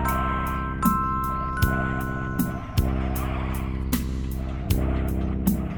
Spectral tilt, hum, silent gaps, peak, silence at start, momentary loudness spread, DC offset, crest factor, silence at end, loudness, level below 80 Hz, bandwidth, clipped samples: -6.5 dB/octave; none; none; -8 dBFS; 0 s; 5 LU; under 0.1%; 18 dB; 0 s; -26 LUFS; -30 dBFS; over 20 kHz; under 0.1%